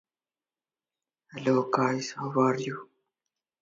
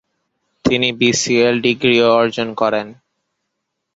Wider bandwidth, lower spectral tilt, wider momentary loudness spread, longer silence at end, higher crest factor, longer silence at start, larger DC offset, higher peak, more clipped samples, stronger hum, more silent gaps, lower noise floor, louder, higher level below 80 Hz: about the same, 7.8 kHz vs 8 kHz; first, -6 dB/octave vs -3.5 dB/octave; first, 13 LU vs 8 LU; second, 0.8 s vs 1 s; first, 22 dB vs 16 dB; first, 1.35 s vs 0.65 s; neither; second, -10 dBFS vs 0 dBFS; neither; neither; neither; first, under -90 dBFS vs -75 dBFS; second, -28 LUFS vs -15 LUFS; second, -74 dBFS vs -50 dBFS